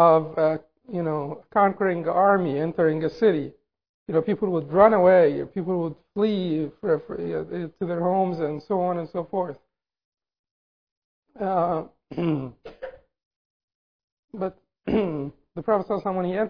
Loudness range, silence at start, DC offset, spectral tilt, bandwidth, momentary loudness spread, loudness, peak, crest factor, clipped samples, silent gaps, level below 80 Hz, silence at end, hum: 10 LU; 0 s; 0.1%; -10 dB/octave; 5.4 kHz; 15 LU; -24 LUFS; -4 dBFS; 20 dB; under 0.1%; 3.89-4.06 s, 10.05-10.12 s, 10.39-10.44 s, 10.51-11.22 s, 13.25-13.68 s, 13.75-14.28 s; -58 dBFS; 0 s; none